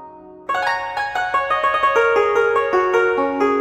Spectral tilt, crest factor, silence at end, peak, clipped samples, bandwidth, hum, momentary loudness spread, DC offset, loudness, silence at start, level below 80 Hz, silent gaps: -4 dB/octave; 12 dB; 0 s; -6 dBFS; under 0.1%; 13 kHz; none; 6 LU; under 0.1%; -18 LUFS; 0 s; -54 dBFS; none